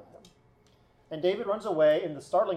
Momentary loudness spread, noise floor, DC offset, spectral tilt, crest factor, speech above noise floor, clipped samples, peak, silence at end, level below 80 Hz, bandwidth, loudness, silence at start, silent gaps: 7 LU; -62 dBFS; under 0.1%; -6 dB/octave; 16 dB; 36 dB; under 0.1%; -14 dBFS; 0 s; -70 dBFS; 10.5 kHz; -28 LUFS; 0.15 s; none